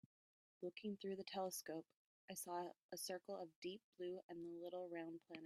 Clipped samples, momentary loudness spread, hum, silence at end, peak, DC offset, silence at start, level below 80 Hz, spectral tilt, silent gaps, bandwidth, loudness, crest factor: under 0.1%; 6 LU; none; 0 s; -34 dBFS; under 0.1%; 0.6 s; under -90 dBFS; -4 dB/octave; 1.94-2.28 s, 2.83-2.89 s, 3.56-3.62 s, 3.84-3.93 s, 4.24-4.29 s; 15 kHz; -51 LUFS; 18 dB